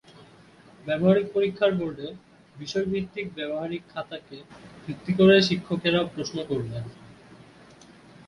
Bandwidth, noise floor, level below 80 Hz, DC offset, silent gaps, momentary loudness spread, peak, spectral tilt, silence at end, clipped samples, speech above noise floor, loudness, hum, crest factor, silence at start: 10.5 kHz; -52 dBFS; -60 dBFS; under 0.1%; none; 20 LU; -6 dBFS; -6 dB/octave; 0.9 s; under 0.1%; 27 dB; -25 LUFS; none; 20 dB; 0.85 s